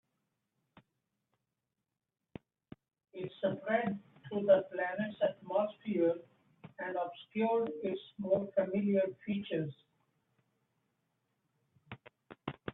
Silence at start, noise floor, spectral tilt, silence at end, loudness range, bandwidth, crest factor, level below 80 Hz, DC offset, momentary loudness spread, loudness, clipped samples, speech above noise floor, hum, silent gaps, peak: 3.15 s; -88 dBFS; -9.5 dB/octave; 0 s; 11 LU; 4 kHz; 22 dB; -78 dBFS; under 0.1%; 22 LU; -35 LUFS; under 0.1%; 54 dB; none; none; -16 dBFS